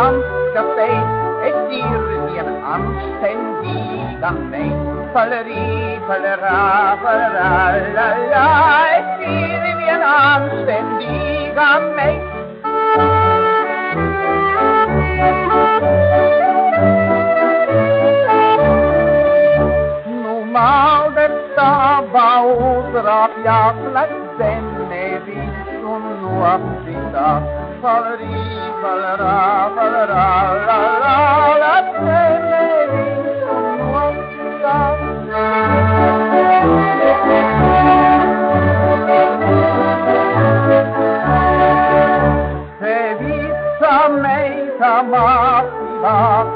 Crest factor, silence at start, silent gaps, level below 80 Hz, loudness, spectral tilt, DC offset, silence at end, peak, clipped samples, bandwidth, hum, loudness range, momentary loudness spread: 14 dB; 0 s; none; -36 dBFS; -14 LUFS; -5 dB/octave; under 0.1%; 0 s; -2 dBFS; under 0.1%; 5.2 kHz; none; 7 LU; 10 LU